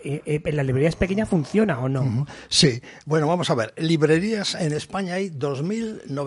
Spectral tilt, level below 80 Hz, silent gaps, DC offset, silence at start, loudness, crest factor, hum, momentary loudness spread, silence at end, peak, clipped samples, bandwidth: -5 dB/octave; -46 dBFS; none; under 0.1%; 0 s; -23 LUFS; 18 dB; none; 8 LU; 0 s; -4 dBFS; under 0.1%; 11.5 kHz